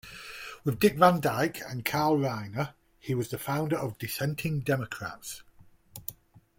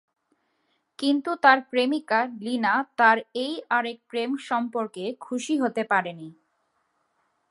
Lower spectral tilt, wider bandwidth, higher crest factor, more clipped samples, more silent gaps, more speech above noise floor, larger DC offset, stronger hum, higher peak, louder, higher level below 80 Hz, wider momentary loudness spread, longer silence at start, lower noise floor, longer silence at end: first, -5.5 dB/octave vs -4 dB/octave; first, 17 kHz vs 11.5 kHz; about the same, 24 dB vs 24 dB; neither; neither; second, 23 dB vs 48 dB; neither; neither; second, -6 dBFS vs -2 dBFS; second, -29 LUFS vs -24 LUFS; first, -60 dBFS vs -82 dBFS; first, 19 LU vs 11 LU; second, 0.05 s vs 1 s; second, -52 dBFS vs -72 dBFS; second, 0.45 s vs 1.2 s